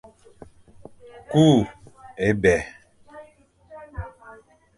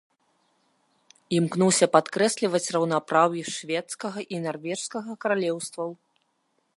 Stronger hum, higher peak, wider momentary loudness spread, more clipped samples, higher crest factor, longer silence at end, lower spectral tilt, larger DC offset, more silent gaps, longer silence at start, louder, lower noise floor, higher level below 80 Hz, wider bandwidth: neither; about the same, -4 dBFS vs -4 dBFS; first, 23 LU vs 12 LU; neither; about the same, 22 dB vs 24 dB; second, 0.45 s vs 0.8 s; first, -6.5 dB/octave vs -4 dB/octave; neither; neither; about the same, 1.3 s vs 1.3 s; first, -20 LUFS vs -25 LUFS; second, -54 dBFS vs -72 dBFS; first, -46 dBFS vs -76 dBFS; about the same, 11.5 kHz vs 11.5 kHz